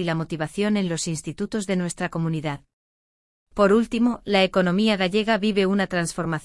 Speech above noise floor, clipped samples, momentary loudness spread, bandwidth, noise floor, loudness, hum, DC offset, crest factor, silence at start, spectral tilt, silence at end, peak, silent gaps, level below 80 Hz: over 68 dB; under 0.1%; 9 LU; 12 kHz; under -90 dBFS; -23 LUFS; none; under 0.1%; 18 dB; 0 s; -5 dB/octave; 0 s; -6 dBFS; 2.73-3.46 s; -52 dBFS